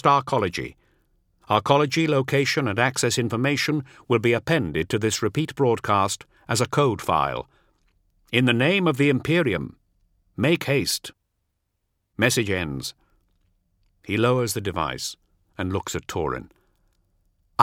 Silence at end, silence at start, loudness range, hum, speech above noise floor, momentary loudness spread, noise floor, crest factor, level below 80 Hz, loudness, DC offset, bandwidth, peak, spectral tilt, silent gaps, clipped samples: 0 s; 0.05 s; 5 LU; none; 53 dB; 12 LU; -75 dBFS; 24 dB; -52 dBFS; -23 LUFS; under 0.1%; 17 kHz; 0 dBFS; -4.5 dB/octave; none; under 0.1%